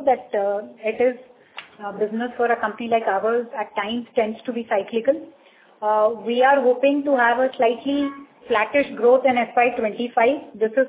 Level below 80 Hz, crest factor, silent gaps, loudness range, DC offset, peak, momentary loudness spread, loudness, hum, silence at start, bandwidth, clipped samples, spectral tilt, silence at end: -66 dBFS; 16 dB; none; 4 LU; under 0.1%; -6 dBFS; 11 LU; -21 LUFS; none; 0 s; 4 kHz; under 0.1%; -8 dB/octave; 0 s